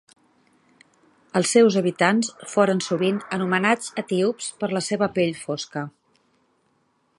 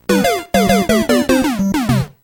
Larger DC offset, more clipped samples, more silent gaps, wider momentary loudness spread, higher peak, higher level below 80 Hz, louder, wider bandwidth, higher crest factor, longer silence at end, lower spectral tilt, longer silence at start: neither; neither; neither; first, 11 LU vs 3 LU; about the same, -2 dBFS vs -2 dBFS; second, -68 dBFS vs -36 dBFS; second, -22 LUFS vs -15 LUFS; second, 11.5 kHz vs 18 kHz; first, 22 dB vs 12 dB; first, 1.3 s vs 0.15 s; about the same, -4.5 dB/octave vs -5 dB/octave; first, 1.35 s vs 0.1 s